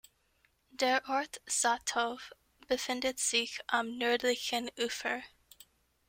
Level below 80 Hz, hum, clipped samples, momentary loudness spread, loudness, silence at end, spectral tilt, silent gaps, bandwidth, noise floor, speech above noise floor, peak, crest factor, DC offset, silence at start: -70 dBFS; none; under 0.1%; 8 LU; -32 LUFS; 0.8 s; 0 dB/octave; none; 16.5 kHz; -73 dBFS; 39 dB; -14 dBFS; 20 dB; under 0.1%; 0.75 s